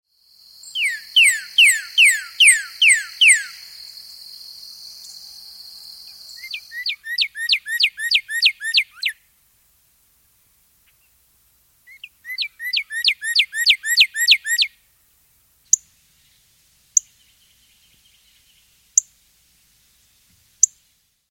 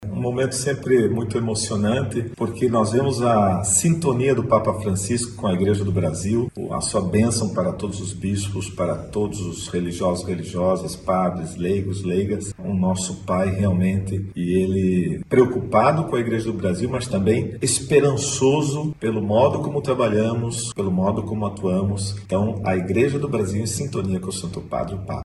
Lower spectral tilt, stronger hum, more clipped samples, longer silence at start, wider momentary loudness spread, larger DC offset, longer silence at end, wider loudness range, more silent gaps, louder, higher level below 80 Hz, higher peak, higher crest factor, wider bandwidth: second, 7 dB/octave vs -5.5 dB/octave; neither; neither; first, 0.65 s vs 0 s; first, 24 LU vs 8 LU; neither; first, 0.65 s vs 0 s; first, 15 LU vs 4 LU; neither; first, -16 LUFS vs -22 LUFS; second, -70 dBFS vs -46 dBFS; about the same, 0 dBFS vs -2 dBFS; about the same, 22 dB vs 18 dB; first, 17 kHz vs 12.5 kHz